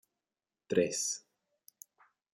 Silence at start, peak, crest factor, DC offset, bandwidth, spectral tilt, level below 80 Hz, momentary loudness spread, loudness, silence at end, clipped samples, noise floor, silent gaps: 0.7 s; -14 dBFS; 24 dB; under 0.1%; 16 kHz; -3 dB/octave; -82 dBFS; 25 LU; -33 LUFS; 1.15 s; under 0.1%; under -90 dBFS; none